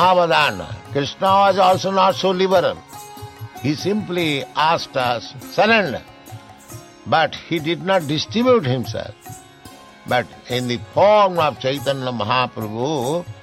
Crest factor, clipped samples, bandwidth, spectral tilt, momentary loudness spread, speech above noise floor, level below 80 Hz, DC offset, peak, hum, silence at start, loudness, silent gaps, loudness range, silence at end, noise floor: 16 dB; under 0.1%; 16.5 kHz; -5 dB/octave; 22 LU; 24 dB; -54 dBFS; under 0.1%; -2 dBFS; none; 0 s; -18 LUFS; none; 3 LU; 0 s; -42 dBFS